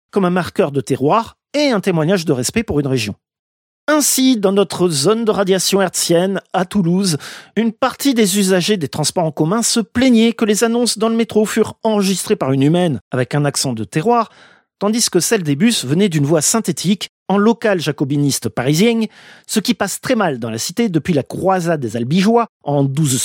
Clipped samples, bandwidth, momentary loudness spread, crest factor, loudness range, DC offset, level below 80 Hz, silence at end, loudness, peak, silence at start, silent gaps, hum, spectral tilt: under 0.1%; 17 kHz; 6 LU; 14 dB; 2 LU; under 0.1%; -52 dBFS; 0 s; -16 LUFS; -2 dBFS; 0.15 s; 3.39-3.87 s, 13.01-13.11 s, 17.09-17.26 s, 22.49-22.60 s; none; -4.5 dB/octave